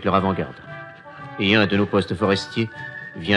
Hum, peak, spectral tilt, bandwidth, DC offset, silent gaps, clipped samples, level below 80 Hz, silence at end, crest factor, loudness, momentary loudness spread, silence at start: none; -2 dBFS; -6 dB/octave; 10.5 kHz; under 0.1%; none; under 0.1%; -54 dBFS; 0 s; 20 dB; -21 LUFS; 20 LU; 0 s